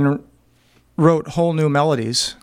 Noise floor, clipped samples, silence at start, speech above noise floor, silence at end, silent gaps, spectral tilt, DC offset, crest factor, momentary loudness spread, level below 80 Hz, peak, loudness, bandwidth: -56 dBFS; under 0.1%; 0 s; 39 dB; 0.1 s; none; -5.5 dB/octave; under 0.1%; 18 dB; 7 LU; -52 dBFS; -2 dBFS; -18 LUFS; 15.5 kHz